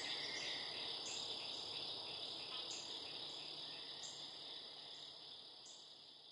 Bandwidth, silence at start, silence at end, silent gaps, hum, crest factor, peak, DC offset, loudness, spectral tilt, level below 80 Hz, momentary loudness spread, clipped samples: 11.5 kHz; 0 s; 0 s; none; none; 16 dB; -34 dBFS; under 0.1%; -46 LUFS; -0.5 dB/octave; -88 dBFS; 11 LU; under 0.1%